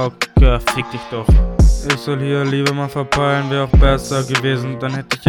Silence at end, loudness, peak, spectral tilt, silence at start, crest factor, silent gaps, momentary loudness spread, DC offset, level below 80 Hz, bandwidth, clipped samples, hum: 0 s; -16 LUFS; 0 dBFS; -5.5 dB/octave; 0 s; 14 dB; none; 8 LU; under 0.1%; -18 dBFS; 13.5 kHz; under 0.1%; none